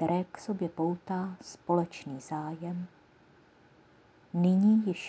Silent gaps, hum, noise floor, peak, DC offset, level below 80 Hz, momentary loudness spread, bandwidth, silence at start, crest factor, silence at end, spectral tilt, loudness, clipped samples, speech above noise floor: none; none; -61 dBFS; -14 dBFS; under 0.1%; -72 dBFS; 15 LU; 8 kHz; 0 s; 18 dB; 0 s; -8 dB/octave; -31 LUFS; under 0.1%; 31 dB